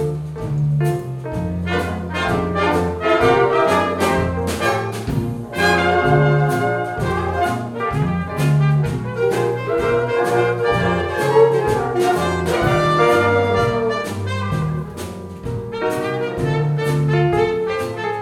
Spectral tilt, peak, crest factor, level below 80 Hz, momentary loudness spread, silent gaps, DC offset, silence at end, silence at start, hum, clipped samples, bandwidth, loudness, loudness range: -6.5 dB/octave; -2 dBFS; 16 dB; -38 dBFS; 9 LU; none; under 0.1%; 0 s; 0 s; none; under 0.1%; 15 kHz; -18 LUFS; 4 LU